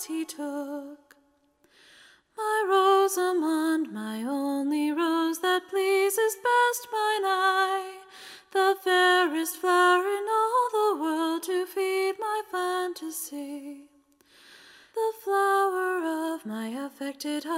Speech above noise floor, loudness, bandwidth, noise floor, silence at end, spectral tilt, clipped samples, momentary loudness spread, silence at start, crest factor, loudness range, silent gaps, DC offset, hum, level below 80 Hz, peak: 40 dB; -26 LUFS; 16 kHz; -66 dBFS; 0 s; -2 dB/octave; under 0.1%; 13 LU; 0 s; 16 dB; 6 LU; none; under 0.1%; none; -82 dBFS; -10 dBFS